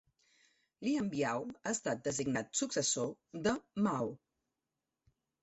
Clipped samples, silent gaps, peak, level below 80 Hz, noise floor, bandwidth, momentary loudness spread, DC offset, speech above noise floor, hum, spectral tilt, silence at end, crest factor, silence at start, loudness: under 0.1%; none; -20 dBFS; -70 dBFS; -90 dBFS; 8.2 kHz; 7 LU; under 0.1%; 54 dB; none; -3.5 dB/octave; 1.25 s; 18 dB; 0.8 s; -36 LUFS